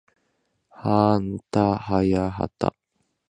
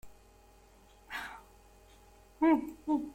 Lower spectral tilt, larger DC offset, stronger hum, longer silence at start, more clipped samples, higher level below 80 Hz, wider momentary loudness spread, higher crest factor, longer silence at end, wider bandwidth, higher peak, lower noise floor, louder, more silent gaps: first, -8.5 dB/octave vs -5.5 dB/octave; neither; neither; first, 0.8 s vs 0.05 s; neither; first, -46 dBFS vs -62 dBFS; second, 8 LU vs 17 LU; about the same, 20 dB vs 18 dB; first, 0.6 s vs 0 s; second, 9.8 kHz vs 16 kHz; first, -4 dBFS vs -16 dBFS; first, -72 dBFS vs -60 dBFS; first, -23 LUFS vs -33 LUFS; neither